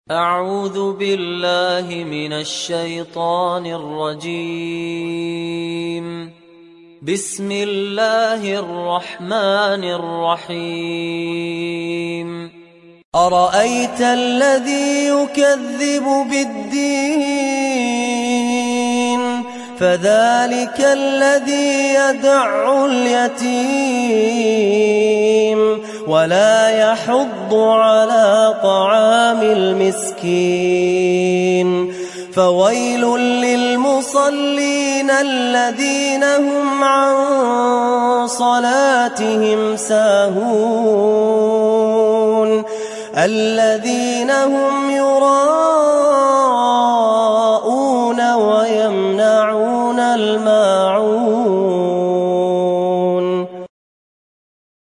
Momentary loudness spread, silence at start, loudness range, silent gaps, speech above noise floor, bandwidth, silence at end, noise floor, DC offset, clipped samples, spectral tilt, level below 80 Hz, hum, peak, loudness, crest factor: 10 LU; 0.1 s; 7 LU; 13.05-13.12 s; 28 dB; 11.5 kHz; 1.15 s; -44 dBFS; under 0.1%; under 0.1%; -4 dB/octave; -64 dBFS; none; -2 dBFS; -15 LUFS; 14 dB